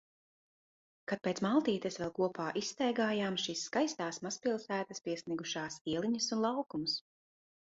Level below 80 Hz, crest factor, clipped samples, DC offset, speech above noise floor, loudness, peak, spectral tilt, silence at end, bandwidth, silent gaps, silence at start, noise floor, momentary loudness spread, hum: -74 dBFS; 18 dB; under 0.1%; under 0.1%; over 55 dB; -36 LUFS; -18 dBFS; -3.5 dB/octave; 0.75 s; 7.6 kHz; 5.81-5.85 s; 1.1 s; under -90 dBFS; 7 LU; none